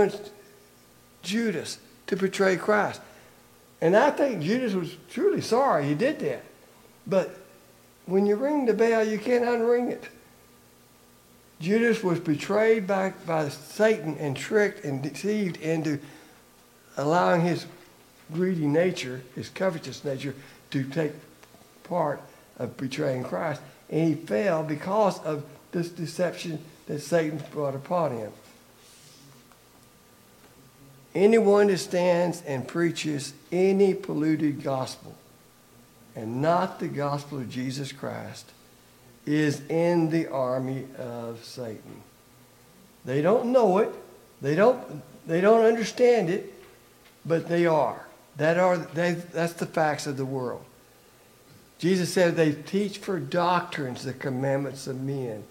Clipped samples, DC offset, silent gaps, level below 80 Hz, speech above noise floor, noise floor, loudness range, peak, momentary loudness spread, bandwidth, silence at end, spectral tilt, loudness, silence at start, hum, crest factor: under 0.1%; under 0.1%; none; -70 dBFS; 31 dB; -56 dBFS; 7 LU; -6 dBFS; 15 LU; 17 kHz; 0.05 s; -6 dB/octave; -26 LUFS; 0 s; none; 22 dB